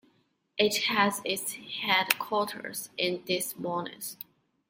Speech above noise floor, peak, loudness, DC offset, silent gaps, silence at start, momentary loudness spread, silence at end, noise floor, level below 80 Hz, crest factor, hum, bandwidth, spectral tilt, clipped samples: 40 dB; -4 dBFS; -29 LUFS; under 0.1%; none; 0.55 s; 14 LU; 0.55 s; -70 dBFS; -76 dBFS; 28 dB; none; 16.5 kHz; -2.5 dB/octave; under 0.1%